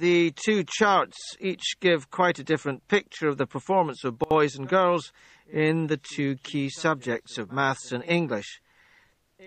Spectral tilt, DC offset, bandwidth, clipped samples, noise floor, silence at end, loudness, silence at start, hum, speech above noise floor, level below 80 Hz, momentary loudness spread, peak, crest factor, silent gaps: -5 dB/octave; under 0.1%; 8.8 kHz; under 0.1%; -62 dBFS; 0 s; -26 LUFS; 0 s; none; 37 dB; -64 dBFS; 10 LU; -8 dBFS; 18 dB; none